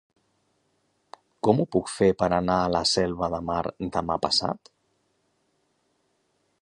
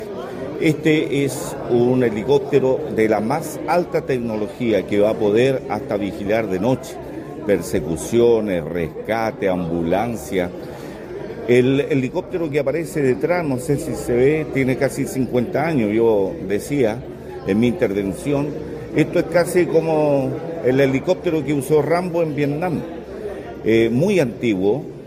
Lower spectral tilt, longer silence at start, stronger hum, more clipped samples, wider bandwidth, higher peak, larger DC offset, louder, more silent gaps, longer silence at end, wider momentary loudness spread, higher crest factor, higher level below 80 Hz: second, -5 dB/octave vs -6.5 dB/octave; first, 1.45 s vs 0 s; neither; neither; second, 11.5 kHz vs 16 kHz; about the same, -4 dBFS vs -2 dBFS; neither; second, -25 LUFS vs -19 LUFS; neither; first, 2.05 s vs 0 s; second, 7 LU vs 10 LU; first, 24 dB vs 18 dB; about the same, -50 dBFS vs -46 dBFS